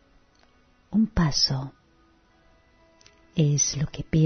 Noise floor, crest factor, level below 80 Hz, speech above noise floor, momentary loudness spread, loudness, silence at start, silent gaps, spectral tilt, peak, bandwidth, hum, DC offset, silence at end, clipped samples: -60 dBFS; 16 dB; -44 dBFS; 37 dB; 11 LU; -24 LUFS; 0.9 s; none; -4.5 dB/octave; -10 dBFS; 6.6 kHz; none; under 0.1%; 0 s; under 0.1%